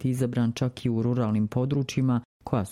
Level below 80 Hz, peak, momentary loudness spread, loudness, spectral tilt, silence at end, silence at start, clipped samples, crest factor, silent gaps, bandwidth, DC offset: -56 dBFS; -10 dBFS; 4 LU; -27 LUFS; -7.5 dB/octave; 0 s; 0 s; under 0.1%; 16 dB; 2.25-2.40 s; 14 kHz; under 0.1%